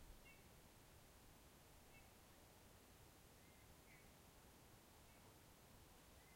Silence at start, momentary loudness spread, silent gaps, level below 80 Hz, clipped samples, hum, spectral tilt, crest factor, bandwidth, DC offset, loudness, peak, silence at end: 0 s; 1 LU; none; -74 dBFS; under 0.1%; none; -3.5 dB/octave; 18 dB; 16.5 kHz; under 0.1%; -67 LUFS; -50 dBFS; 0 s